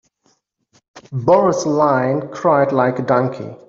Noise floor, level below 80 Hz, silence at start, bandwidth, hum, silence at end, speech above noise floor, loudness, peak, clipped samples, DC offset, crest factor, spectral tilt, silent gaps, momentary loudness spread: -63 dBFS; -58 dBFS; 0.95 s; 7.6 kHz; none; 0.1 s; 47 dB; -16 LUFS; -2 dBFS; under 0.1%; under 0.1%; 16 dB; -6.5 dB/octave; none; 8 LU